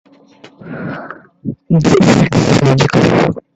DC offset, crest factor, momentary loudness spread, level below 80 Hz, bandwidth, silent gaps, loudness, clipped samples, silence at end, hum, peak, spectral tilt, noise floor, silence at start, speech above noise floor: under 0.1%; 12 dB; 18 LU; -40 dBFS; 8.4 kHz; none; -11 LUFS; under 0.1%; 0.15 s; none; 0 dBFS; -6.5 dB/octave; -42 dBFS; 0.65 s; 31 dB